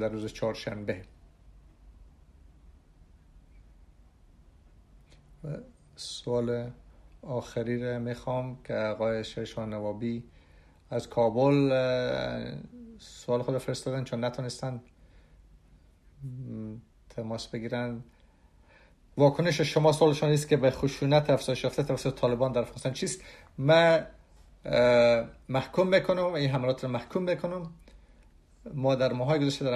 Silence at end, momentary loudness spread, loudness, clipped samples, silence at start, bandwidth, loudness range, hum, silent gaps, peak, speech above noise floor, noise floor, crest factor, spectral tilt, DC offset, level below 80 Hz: 0 s; 18 LU; -28 LUFS; under 0.1%; 0 s; 13.5 kHz; 14 LU; none; none; -10 dBFS; 31 dB; -59 dBFS; 20 dB; -6 dB/octave; under 0.1%; -56 dBFS